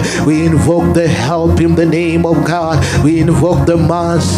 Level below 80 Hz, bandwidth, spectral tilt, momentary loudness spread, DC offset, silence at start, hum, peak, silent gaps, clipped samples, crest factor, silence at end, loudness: -30 dBFS; 15 kHz; -6.5 dB/octave; 2 LU; under 0.1%; 0 s; none; 0 dBFS; none; under 0.1%; 10 dB; 0 s; -11 LUFS